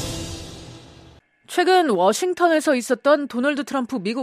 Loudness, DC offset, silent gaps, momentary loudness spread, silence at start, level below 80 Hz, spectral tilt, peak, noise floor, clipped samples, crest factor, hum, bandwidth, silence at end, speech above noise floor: -20 LUFS; under 0.1%; none; 16 LU; 0 s; -48 dBFS; -4 dB/octave; -4 dBFS; -50 dBFS; under 0.1%; 16 dB; none; 15 kHz; 0 s; 30 dB